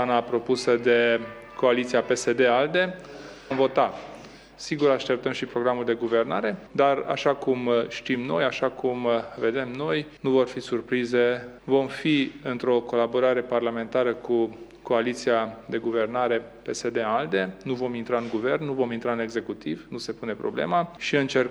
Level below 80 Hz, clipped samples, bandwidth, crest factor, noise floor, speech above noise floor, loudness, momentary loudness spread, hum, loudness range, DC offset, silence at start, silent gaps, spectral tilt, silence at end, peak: -60 dBFS; under 0.1%; 11.5 kHz; 18 dB; -45 dBFS; 20 dB; -25 LUFS; 9 LU; none; 4 LU; under 0.1%; 0 s; none; -5 dB/octave; 0 s; -8 dBFS